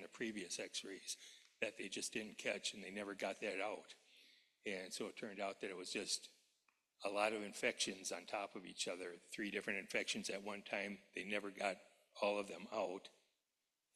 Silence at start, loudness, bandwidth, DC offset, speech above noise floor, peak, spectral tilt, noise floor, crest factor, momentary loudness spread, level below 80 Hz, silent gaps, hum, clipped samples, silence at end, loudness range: 0 s; -45 LUFS; 13.5 kHz; under 0.1%; over 45 dB; -24 dBFS; -2 dB/octave; under -90 dBFS; 22 dB; 9 LU; -88 dBFS; none; none; under 0.1%; 0.85 s; 3 LU